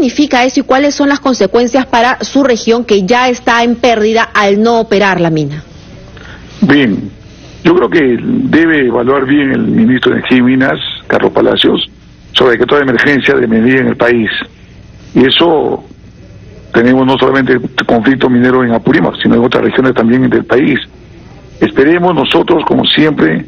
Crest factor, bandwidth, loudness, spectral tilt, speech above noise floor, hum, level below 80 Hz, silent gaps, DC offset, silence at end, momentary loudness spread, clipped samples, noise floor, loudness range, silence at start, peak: 10 dB; 6.8 kHz; -9 LUFS; -5.5 dB/octave; 25 dB; none; -40 dBFS; none; under 0.1%; 0 s; 6 LU; 0.3%; -34 dBFS; 2 LU; 0 s; 0 dBFS